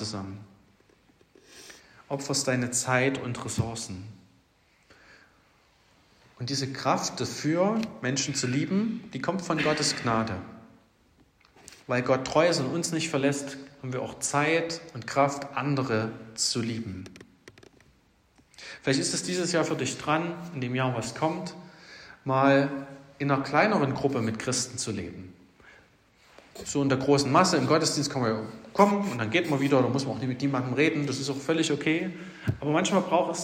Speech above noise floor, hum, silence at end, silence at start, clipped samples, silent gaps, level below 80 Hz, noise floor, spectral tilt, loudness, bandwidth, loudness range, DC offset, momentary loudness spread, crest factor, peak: 37 dB; none; 0 s; 0 s; under 0.1%; none; -64 dBFS; -64 dBFS; -4.5 dB/octave; -27 LUFS; 16 kHz; 6 LU; under 0.1%; 16 LU; 24 dB; -4 dBFS